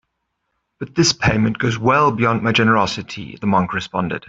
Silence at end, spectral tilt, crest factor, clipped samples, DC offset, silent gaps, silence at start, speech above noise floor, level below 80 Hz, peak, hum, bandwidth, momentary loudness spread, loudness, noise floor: 0.1 s; -5 dB/octave; 16 dB; under 0.1%; under 0.1%; none; 0.8 s; 56 dB; -46 dBFS; -2 dBFS; none; 8 kHz; 10 LU; -17 LUFS; -73 dBFS